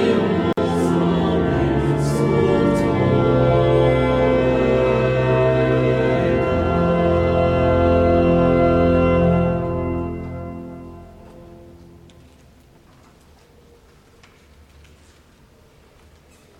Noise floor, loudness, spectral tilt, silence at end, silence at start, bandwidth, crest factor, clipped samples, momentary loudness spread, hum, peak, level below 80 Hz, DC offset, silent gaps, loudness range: -51 dBFS; -18 LUFS; -8 dB/octave; 4.9 s; 0 s; 12 kHz; 14 dB; under 0.1%; 8 LU; none; -4 dBFS; -34 dBFS; under 0.1%; none; 9 LU